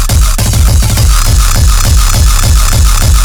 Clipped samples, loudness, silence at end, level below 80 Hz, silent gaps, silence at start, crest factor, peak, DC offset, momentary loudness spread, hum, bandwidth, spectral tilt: 1%; -8 LUFS; 0 s; -8 dBFS; none; 0 s; 6 dB; 0 dBFS; 4%; 1 LU; none; over 20 kHz; -3.5 dB/octave